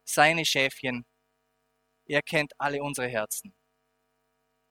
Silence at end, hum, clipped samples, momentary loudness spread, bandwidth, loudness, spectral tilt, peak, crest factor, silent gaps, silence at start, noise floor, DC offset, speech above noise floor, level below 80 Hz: 1.2 s; none; under 0.1%; 12 LU; 20 kHz; -27 LUFS; -3 dB/octave; -4 dBFS; 26 dB; none; 0.05 s; -75 dBFS; under 0.1%; 48 dB; -66 dBFS